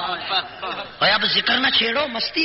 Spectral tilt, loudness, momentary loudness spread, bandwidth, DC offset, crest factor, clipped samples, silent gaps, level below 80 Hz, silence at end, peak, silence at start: 1 dB/octave; -19 LUFS; 13 LU; 6 kHz; under 0.1%; 16 dB; under 0.1%; none; -56 dBFS; 0 s; -6 dBFS; 0 s